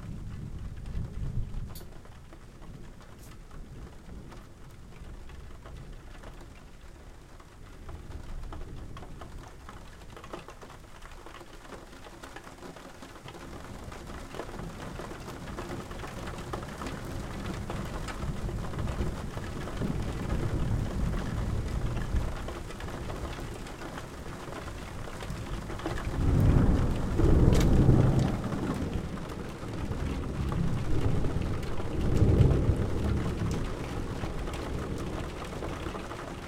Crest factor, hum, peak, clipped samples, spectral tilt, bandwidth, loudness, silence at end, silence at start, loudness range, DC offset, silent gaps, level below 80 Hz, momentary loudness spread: 24 dB; none; -6 dBFS; under 0.1%; -7 dB/octave; 16 kHz; -32 LUFS; 0 s; 0 s; 21 LU; under 0.1%; none; -36 dBFS; 22 LU